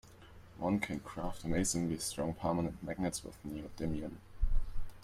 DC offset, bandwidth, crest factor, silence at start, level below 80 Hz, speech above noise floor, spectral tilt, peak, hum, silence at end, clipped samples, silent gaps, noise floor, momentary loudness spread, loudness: under 0.1%; 15.5 kHz; 16 dB; 0.05 s; -40 dBFS; 19 dB; -5 dB/octave; -20 dBFS; none; 0 s; under 0.1%; none; -55 dBFS; 12 LU; -38 LUFS